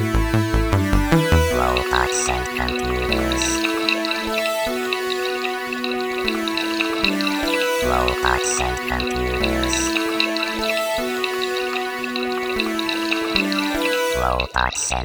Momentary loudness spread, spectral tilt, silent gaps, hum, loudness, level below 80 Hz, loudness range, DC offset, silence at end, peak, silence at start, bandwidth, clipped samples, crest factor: 4 LU; -4 dB/octave; none; none; -20 LUFS; -30 dBFS; 2 LU; under 0.1%; 0 s; 0 dBFS; 0 s; over 20 kHz; under 0.1%; 20 dB